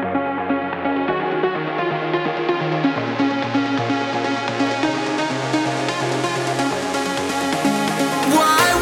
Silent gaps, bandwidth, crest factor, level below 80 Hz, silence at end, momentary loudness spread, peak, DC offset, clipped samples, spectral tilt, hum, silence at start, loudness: none; 19 kHz; 20 dB; -58 dBFS; 0 s; 4 LU; 0 dBFS; under 0.1%; under 0.1%; -4.5 dB/octave; none; 0 s; -20 LUFS